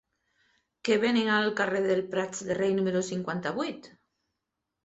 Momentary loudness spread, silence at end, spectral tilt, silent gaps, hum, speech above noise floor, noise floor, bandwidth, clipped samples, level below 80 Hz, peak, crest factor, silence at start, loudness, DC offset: 9 LU; 0.95 s; -4.5 dB/octave; none; none; 57 dB; -85 dBFS; 8.2 kHz; under 0.1%; -68 dBFS; -12 dBFS; 18 dB; 0.85 s; -28 LUFS; under 0.1%